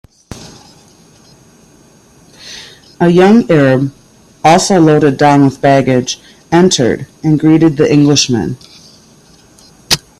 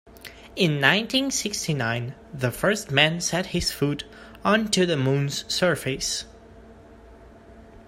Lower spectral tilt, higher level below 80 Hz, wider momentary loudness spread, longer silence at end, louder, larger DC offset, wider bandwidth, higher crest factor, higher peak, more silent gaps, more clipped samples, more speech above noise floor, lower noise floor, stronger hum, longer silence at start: about the same, -5 dB/octave vs -4 dB/octave; about the same, -46 dBFS vs -50 dBFS; first, 21 LU vs 13 LU; first, 0.2 s vs 0.05 s; first, -10 LUFS vs -23 LUFS; neither; about the same, 15.5 kHz vs 16 kHz; second, 12 dB vs 24 dB; about the same, 0 dBFS vs 0 dBFS; neither; neither; first, 35 dB vs 24 dB; second, -44 dBFS vs -48 dBFS; neither; first, 0.3 s vs 0.05 s